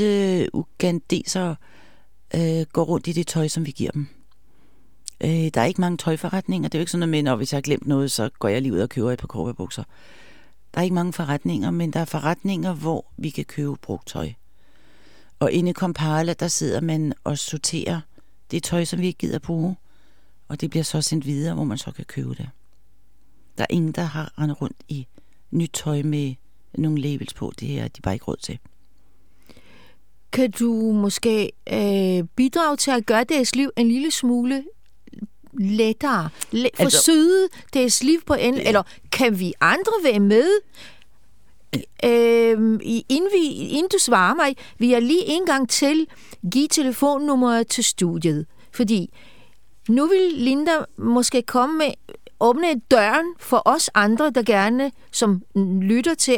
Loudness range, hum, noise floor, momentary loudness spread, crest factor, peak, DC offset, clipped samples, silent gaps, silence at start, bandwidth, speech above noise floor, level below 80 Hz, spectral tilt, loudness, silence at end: 9 LU; none; -61 dBFS; 13 LU; 22 dB; 0 dBFS; 0.7%; under 0.1%; none; 0 s; 19.5 kHz; 40 dB; -54 dBFS; -4.5 dB/octave; -21 LUFS; 0 s